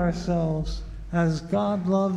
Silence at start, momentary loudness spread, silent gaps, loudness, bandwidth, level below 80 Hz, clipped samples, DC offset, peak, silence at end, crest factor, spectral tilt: 0 s; 7 LU; none; -26 LUFS; 9.4 kHz; -38 dBFS; under 0.1%; under 0.1%; -14 dBFS; 0 s; 12 dB; -7.5 dB/octave